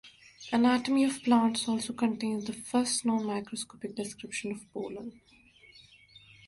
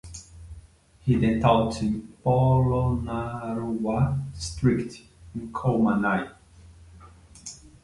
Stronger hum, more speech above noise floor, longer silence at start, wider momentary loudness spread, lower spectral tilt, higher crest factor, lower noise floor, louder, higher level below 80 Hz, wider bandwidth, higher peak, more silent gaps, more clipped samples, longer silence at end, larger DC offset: neither; about the same, 27 dB vs 27 dB; about the same, 0.05 s vs 0.05 s; second, 13 LU vs 20 LU; second, -3.5 dB/octave vs -7 dB/octave; about the same, 18 dB vs 20 dB; first, -57 dBFS vs -51 dBFS; second, -30 LUFS vs -25 LUFS; second, -70 dBFS vs -42 dBFS; about the same, 11.5 kHz vs 11.5 kHz; second, -14 dBFS vs -6 dBFS; neither; neither; about the same, 0.3 s vs 0.3 s; neither